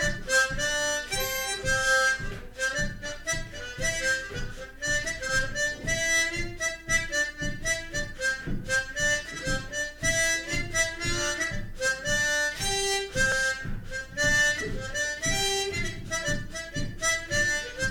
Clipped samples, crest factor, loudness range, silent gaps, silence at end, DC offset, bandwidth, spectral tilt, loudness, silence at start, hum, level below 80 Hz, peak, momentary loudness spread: under 0.1%; 16 dB; 2 LU; none; 0 s; under 0.1%; 18 kHz; -2 dB/octave; -27 LUFS; 0 s; none; -38 dBFS; -12 dBFS; 9 LU